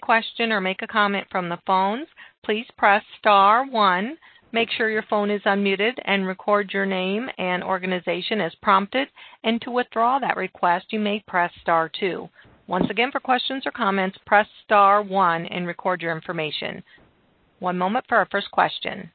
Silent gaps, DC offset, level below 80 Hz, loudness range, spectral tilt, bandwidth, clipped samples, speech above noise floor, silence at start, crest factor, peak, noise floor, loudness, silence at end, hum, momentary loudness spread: 2.38-2.42 s; under 0.1%; -64 dBFS; 3 LU; -9.5 dB/octave; 4.6 kHz; under 0.1%; 39 dB; 0 s; 20 dB; -2 dBFS; -61 dBFS; -22 LUFS; 0.05 s; none; 9 LU